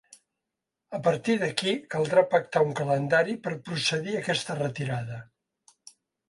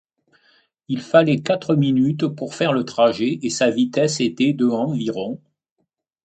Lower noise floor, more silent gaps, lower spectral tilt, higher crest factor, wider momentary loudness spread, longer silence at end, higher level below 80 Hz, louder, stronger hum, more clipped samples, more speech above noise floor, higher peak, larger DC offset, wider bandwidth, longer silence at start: first, -86 dBFS vs -74 dBFS; neither; about the same, -5 dB/octave vs -5.5 dB/octave; about the same, 22 dB vs 20 dB; about the same, 9 LU vs 10 LU; first, 1.05 s vs 0.9 s; about the same, -68 dBFS vs -64 dBFS; second, -27 LUFS vs -20 LUFS; neither; neither; first, 59 dB vs 55 dB; second, -6 dBFS vs 0 dBFS; neither; first, 11.5 kHz vs 9 kHz; about the same, 0.9 s vs 0.9 s